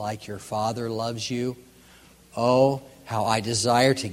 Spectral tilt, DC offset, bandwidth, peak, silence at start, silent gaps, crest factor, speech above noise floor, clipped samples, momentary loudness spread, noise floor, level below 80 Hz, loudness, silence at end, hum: -4.5 dB/octave; under 0.1%; 16 kHz; -6 dBFS; 0 s; none; 20 dB; 28 dB; under 0.1%; 14 LU; -53 dBFS; -60 dBFS; -25 LUFS; 0 s; none